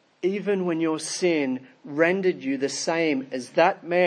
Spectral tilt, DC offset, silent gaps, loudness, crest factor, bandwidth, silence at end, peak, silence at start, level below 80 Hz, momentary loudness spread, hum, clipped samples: -4.5 dB/octave; under 0.1%; none; -25 LUFS; 18 dB; 10.5 kHz; 0 s; -6 dBFS; 0.25 s; -82 dBFS; 7 LU; none; under 0.1%